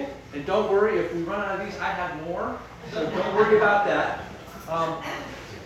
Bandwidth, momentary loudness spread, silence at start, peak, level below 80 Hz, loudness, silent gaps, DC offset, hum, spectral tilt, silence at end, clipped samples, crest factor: 14 kHz; 15 LU; 0 s; -8 dBFS; -52 dBFS; -25 LUFS; none; under 0.1%; none; -5.5 dB/octave; 0 s; under 0.1%; 18 dB